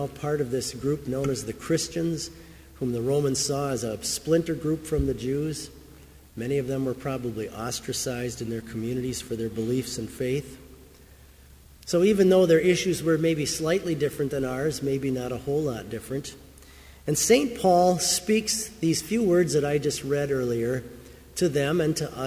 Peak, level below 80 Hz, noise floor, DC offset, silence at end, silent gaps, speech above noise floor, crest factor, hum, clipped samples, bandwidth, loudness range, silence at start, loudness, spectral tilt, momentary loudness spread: -8 dBFS; -48 dBFS; -51 dBFS; under 0.1%; 0 s; none; 26 dB; 18 dB; none; under 0.1%; 16 kHz; 7 LU; 0 s; -26 LUFS; -4.5 dB/octave; 12 LU